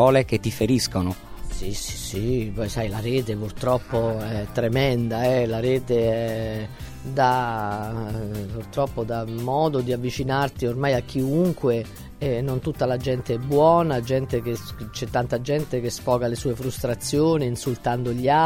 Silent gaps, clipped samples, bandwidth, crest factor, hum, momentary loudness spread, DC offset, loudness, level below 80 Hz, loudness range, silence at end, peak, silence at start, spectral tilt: none; under 0.1%; 16.5 kHz; 18 dB; none; 9 LU; under 0.1%; -24 LUFS; -40 dBFS; 3 LU; 0 s; -4 dBFS; 0 s; -6 dB/octave